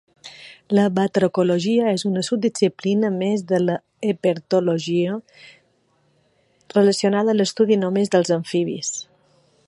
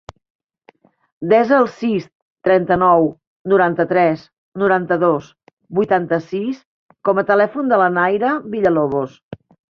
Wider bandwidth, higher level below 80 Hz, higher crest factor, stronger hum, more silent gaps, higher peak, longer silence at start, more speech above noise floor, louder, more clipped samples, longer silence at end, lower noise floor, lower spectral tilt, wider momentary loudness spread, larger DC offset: first, 11.5 kHz vs 6.8 kHz; second, -68 dBFS vs -56 dBFS; about the same, 18 dB vs 16 dB; neither; second, none vs 2.15-2.36 s, 3.27-3.45 s, 4.33-4.52 s, 5.53-5.57 s, 6.66-6.89 s, 9.23-9.31 s; about the same, -2 dBFS vs 0 dBFS; second, 0.25 s vs 1.2 s; first, 44 dB vs 37 dB; second, -20 LUFS vs -17 LUFS; neither; first, 0.65 s vs 0.35 s; first, -63 dBFS vs -53 dBFS; second, -5.5 dB/octave vs -8 dB/octave; about the same, 8 LU vs 10 LU; neither